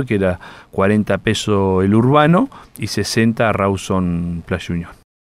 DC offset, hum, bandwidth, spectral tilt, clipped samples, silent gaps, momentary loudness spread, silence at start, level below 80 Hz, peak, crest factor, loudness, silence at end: under 0.1%; none; 15 kHz; -6 dB/octave; under 0.1%; none; 13 LU; 0 s; -42 dBFS; 0 dBFS; 16 dB; -17 LUFS; 0.3 s